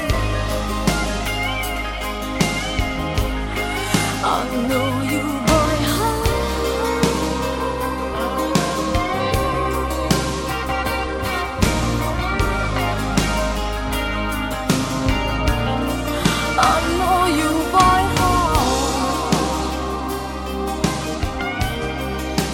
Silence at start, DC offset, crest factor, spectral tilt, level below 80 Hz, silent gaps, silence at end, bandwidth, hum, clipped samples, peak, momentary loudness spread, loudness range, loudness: 0 s; under 0.1%; 20 dB; -4.5 dB/octave; -28 dBFS; none; 0 s; 17 kHz; none; under 0.1%; 0 dBFS; 7 LU; 5 LU; -20 LUFS